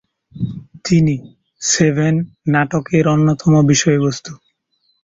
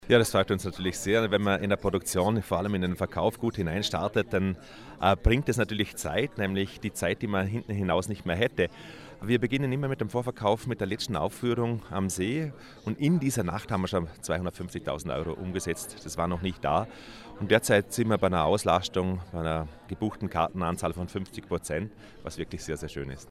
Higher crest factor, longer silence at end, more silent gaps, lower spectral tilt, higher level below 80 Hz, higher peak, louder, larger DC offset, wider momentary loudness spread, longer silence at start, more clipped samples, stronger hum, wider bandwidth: second, 14 dB vs 22 dB; first, 0.7 s vs 0 s; neither; about the same, -5.5 dB/octave vs -5.5 dB/octave; about the same, -48 dBFS vs -46 dBFS; first, -2 dBFS vs -8 dBFS; first, -16 LUFS vs -29 LUFS; neither; about the same, 13 LU vs 11 LU; first, 0.35 s vs 0 s; neither; neither; second, 8 kHz vs 16 kHz